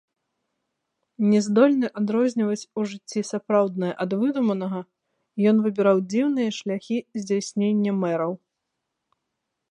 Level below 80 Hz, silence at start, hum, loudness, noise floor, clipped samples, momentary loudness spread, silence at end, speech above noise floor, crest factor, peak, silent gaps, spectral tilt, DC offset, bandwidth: -76 dBFS; 1.2 s; none; -23 LUFS; -81 dBFS; under 0.1%; 10 LU; 1.35 s; 58 dB; 20 dB; -4 dBFS; none; -6.5 dB/octave; under 0.1%; 10.5 kHz